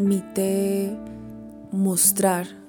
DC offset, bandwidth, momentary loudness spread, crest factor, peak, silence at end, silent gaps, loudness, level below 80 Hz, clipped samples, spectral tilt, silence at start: under 0.1%; 17.5 kHz; 21 LU; 18 dB; -4 dBFS; 0 s; none; -22 LUFS; -58 dBFS; under 0.1%; -4.5 dB/octave; 0 s